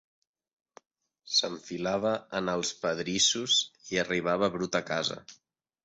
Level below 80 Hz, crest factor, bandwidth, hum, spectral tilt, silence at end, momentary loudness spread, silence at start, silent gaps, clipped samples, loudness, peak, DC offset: -66 dBFS; 20 dB; 8.4 kHz; none; -2.5 dB/octave; 0.5 s; 8 LU; 1.25 s; none; under 0.1%; -28 LUFS; -12 dBFS; under 0.1%